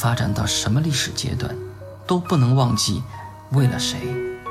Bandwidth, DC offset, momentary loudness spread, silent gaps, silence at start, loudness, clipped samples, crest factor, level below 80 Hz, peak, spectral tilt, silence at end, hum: 14.5 kHz; under 0.1%; 15 LU; none; 0 s; -21 LUFS; under 0.1%; 16 dB; -44 dBFS; -6 dBFS; -5 dB/octave; 0 s; none